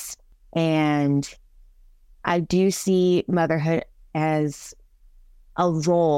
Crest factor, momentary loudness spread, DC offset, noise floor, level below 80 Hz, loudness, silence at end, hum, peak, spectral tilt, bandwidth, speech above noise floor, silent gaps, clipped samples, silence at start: 16 dB; 15 LU; under 0.1%; -52 dBFS; -52 dBFS; -23 LUFS; 0 s; none; -8 dBFS; -6 dB/octave; 16 kHz; 31 dB; none; under 0.1%; 0 s